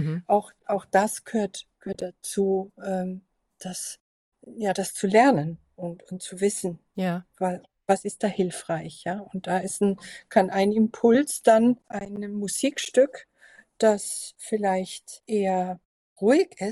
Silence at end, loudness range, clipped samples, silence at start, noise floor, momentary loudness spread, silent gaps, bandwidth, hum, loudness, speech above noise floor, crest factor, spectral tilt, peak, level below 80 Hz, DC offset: 0 s; 6 LU; under 0.1%; 0 s; -55 dBFS; 16 LU; 4.00-4.32 s, 15.85-16.16 s; 13.5 kHz; none; -25 LUFS; 31 dB; 20 dB; -5 dB/octave; -4 dBFS; -68 dBFS; under 0.1%